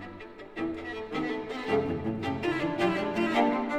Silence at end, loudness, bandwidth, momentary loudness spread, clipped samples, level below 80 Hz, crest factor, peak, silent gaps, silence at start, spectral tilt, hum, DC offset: 0 s; -30 LUFS; 12.5 kHz; 11 LU; under 0.1%; -58 dBFS; 20 dB; -10 dBFS; none; 0 s; -6.5 dB/octave; none; 0.1%